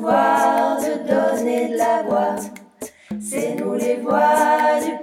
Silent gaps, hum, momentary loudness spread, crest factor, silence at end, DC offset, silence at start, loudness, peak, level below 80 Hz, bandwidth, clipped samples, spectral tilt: none; none; 15 LU; 16 dB; 0 s; under 0.1%; 0 s; -19 LUFS; -4 dBFS; -64 dBFS; 17 kHz; under 0.1%; -4.5 dB/octave